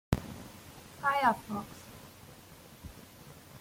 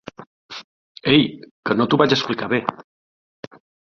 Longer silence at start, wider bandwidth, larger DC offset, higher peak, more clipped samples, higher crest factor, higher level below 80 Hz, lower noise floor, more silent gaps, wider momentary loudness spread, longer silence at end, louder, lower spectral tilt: about the same, 0.1 s vs 0.2 s; first, 16.5 kHz vs 7 kHz; neither; second, -10 dBFS vs -2 dBFS; neither; first, 26 dB vs 20 dB; about the same, -52 dBFS vs -56 dBFS; second, -54 dBFS vs under -90 dBFS; second, none vs 0.27-0.49 s, 0.64-0.95 s, 1.51-1.63 s; about the same, 24 LU vs 24 LU; second, 0 s vs 1.05 s; second, -32 LUFS vs -19 LUFS; about the same, -5.5 dB/octave vs -6 dB/octave